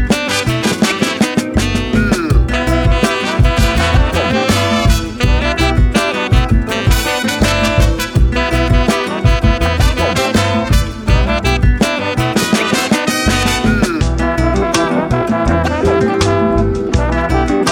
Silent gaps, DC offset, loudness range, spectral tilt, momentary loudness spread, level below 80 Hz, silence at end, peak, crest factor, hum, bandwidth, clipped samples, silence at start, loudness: none; under 0.1%; 1 LU; -5 dB/octave; 2 LU; -18 dBFS; 0 s; 0 dBFS; 12 dB; none; 17.5 kHz; under 0.1%; 0 s; -14 LUFS